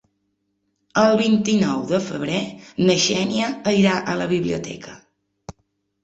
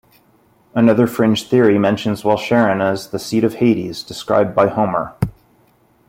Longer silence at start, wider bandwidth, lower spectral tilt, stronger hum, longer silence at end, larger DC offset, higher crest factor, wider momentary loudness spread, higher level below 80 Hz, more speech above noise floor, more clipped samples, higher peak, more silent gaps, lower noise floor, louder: first, 0.95 s vs 0.75 s; second, 8.2 kHz vs 16.5 kHz; second, -4.5 dB/octave vs -6.5 dB/octave; neither; second, 0.55 s vs 0.8 s; neither; about the same, 18 dB vs 16 dB; about the same, 11 LU vs 10 LU; second, -56 dBFS vs -50 dBFS; first, 52 dB vs 39 dB; neither; about the same, -4 dBFS vs -2 dBFS; neither; first, -72 dBFS vs -55 dBFS; second, -20 LUFS vs -16 LUFS